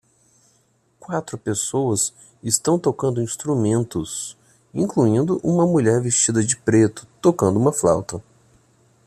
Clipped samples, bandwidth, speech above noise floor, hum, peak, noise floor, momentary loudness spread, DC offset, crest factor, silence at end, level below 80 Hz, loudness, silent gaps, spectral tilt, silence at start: under 0.1%; 14 kHz; 42 dB; none; -2 dBFS; -62 dBFS; 11 LU; under 0.1%; 18 dB; 0.85 s; -54 dBFS; -20 LUFS; none; -5 dB/octave; 1.1 s